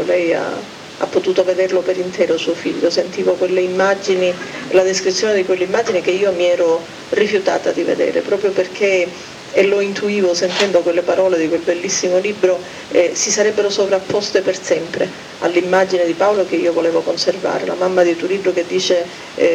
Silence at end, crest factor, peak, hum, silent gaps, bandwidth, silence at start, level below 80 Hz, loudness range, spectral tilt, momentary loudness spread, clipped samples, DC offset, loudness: 0 s; 14 dB; -2 dBFS; none; none; 11.5 kHz; 0 s; -60 dBFS; 1 LU; -3.5 dB/octave; 5 LU; under 0.1%; under 0.1%; -16 LUFS